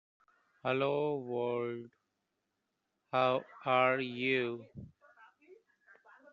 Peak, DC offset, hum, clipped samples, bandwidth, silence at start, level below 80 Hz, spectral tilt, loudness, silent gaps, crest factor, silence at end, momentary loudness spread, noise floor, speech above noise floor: -14 dBFS; under 0.1%; none; under 0.1%; 7 kHz; 0.65 s; -76 dBFS; -3.5 dB/octave; -33 LUFS; none; 22 dB; 0.8 s; 15 LU; -85 dBFS; 51 dB